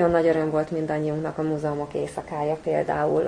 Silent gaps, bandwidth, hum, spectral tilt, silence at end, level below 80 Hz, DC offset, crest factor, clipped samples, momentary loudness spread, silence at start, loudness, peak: none; 10.5 kHz; none; -7.5 dB/octave; 0 s; -52 dBFS; under 0.1%; 16 dB; under 0.1%; 8 LU; 0 s; -25 LUFS; -8 dBFS